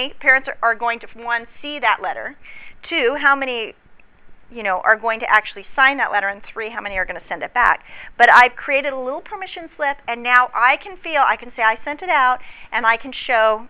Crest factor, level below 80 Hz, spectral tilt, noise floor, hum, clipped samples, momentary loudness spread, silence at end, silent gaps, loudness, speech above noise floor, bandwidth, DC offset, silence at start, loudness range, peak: 18 dB; -50 dBFS; -5 dB/octave; -43 dBFS; none; under 0.1%; 13 LU; 0 s; none; -17 LUFS; 24 dB; 4 kHz; under 0.1%; 0 s; 5 LU; 0 dBFS